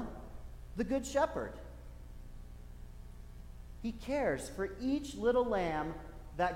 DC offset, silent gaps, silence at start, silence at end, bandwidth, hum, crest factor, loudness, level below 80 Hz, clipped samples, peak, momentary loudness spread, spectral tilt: under 0.1%; none; 0 s; 0 s; 16.5 kHz; 60 Hz at -55 dBFS; 18 dB; -36 LUFS; -50 dBFS; under 0.1%; -20 dBFS; 21 LU; -5.5 dB/octave